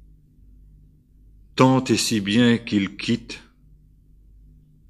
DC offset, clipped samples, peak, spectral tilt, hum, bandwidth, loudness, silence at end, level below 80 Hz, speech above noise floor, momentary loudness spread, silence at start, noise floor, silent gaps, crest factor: under 0.1%; under 0.1%; 0 dBFS; -5 dB/octave; none; 13.5 kHz; -20 LUFS; 1.5 s; -52 dBFS; 33 dB; 14 LU; 1.55 s; -53 dBFS; none; 24 dB